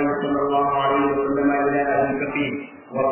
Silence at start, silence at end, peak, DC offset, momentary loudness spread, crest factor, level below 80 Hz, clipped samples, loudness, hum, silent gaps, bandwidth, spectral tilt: 0 s; 0 s; -8 dBFS; under 0.1%; 6 LU; 12 dB; -52 dBFS; under 0.1%; -21 LUFS; none; none; 3.2 kHz; -10 dB/octave